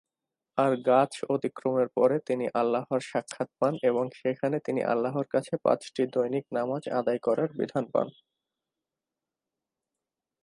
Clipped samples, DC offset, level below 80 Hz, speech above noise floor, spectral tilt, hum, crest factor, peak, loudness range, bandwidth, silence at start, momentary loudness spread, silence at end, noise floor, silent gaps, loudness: under 0.1%; under 0.1%; -78 dBFS; 62 dB; -6.5 dB/octave; none; 18 dB; -10 dBFS; 5 LU; 11.5 kHz; 0.55 s; 6 LU; 2.35 s; -89 dBFS; none; -28 LUFS